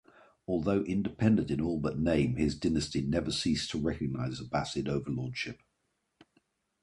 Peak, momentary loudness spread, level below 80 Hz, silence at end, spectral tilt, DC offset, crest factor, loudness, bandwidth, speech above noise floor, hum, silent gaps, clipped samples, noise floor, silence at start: -12 dBFS; 8 LU; -50 dBFS; 1.3 s; -6 dB/octave; under 0.1%; 20 dB; -31 LUFS; 11.5 kHz; 49 dB; none; none; under 0.1%; -79 dBFS; 0.5 s